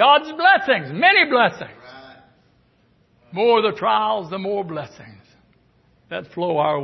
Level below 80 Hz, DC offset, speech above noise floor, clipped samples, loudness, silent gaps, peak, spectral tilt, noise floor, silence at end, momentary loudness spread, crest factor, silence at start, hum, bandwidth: -66 dBFS; under 0.1%; 41 dB; under 0.1%; -18 LUFS; none; -2 dBFS; -6 dB/octave; -59 dBFS; 0 s; 18 LU; 18 dB; 0 s; none; 6.2 kHz